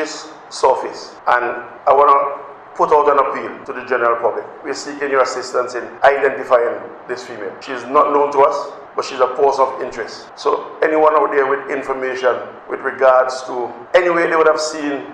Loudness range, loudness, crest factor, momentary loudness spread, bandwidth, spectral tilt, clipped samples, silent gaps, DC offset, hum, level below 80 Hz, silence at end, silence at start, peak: 2 LU; -16 LUFS; 16 dB; 15 LU; 10 kHz; -3.5 dB/octave; under 0.1%; none; under 0.1%; none; -58 dBFS; 0 s; 0 s; 0 dBFS